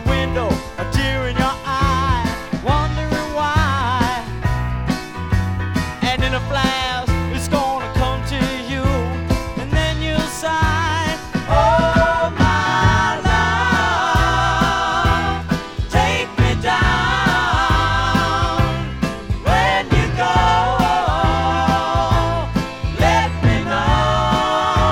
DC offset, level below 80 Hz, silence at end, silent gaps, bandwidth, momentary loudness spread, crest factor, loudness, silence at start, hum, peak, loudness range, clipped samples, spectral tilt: under 0.1%; -26 dBFS; 0 s; none; 17 kHz; 7 LU; 16 dB; -18 LUFS; 0 s; none; -2 dBFS; 4 LU; under 0.1%; -5.5 dB/octave